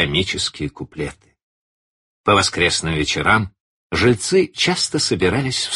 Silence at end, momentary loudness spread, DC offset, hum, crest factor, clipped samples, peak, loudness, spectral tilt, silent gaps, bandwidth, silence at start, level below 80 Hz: 0 s; 13 LU; under 0.1%; none; 18 dB; under 0.1%; -2 dBFS; -18 LUFS; -3.5 dB/octave; 1.43-2.24 s, 3.60-3.90 s; 11.5 kHz; 0 s; -42 dBFS